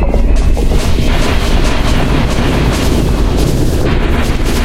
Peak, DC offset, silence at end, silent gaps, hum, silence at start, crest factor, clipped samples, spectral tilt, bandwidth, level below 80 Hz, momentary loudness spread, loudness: 0 dBFS; 1%; 0 s; none; none; 0 s; 10 dB; under 0.1%; -5.5 dB/octave; 15.5 kHz; -12 dBFS; 1 LU; -13 LUFS